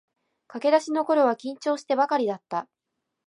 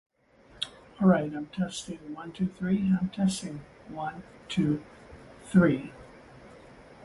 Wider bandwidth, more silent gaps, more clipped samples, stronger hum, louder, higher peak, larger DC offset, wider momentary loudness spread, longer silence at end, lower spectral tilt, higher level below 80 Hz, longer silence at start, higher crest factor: about the same, 11 kHz vs 11.5 kHz; neither; neither; neither; first, -25 LUFS vs -29 LUFS; about the same, -8 dBFS vs -8 dBFS; neither; second, 11 LU vs 22 LU; first, 0.65 s vs 0.2 s; second, -4.5 dB/octave vs -6.5 dB/octave; second, -84 dBFS vs -58 dBFS; about the same, 0.55 s vs 0.6 s; about the same, 18 dB vs 20 dB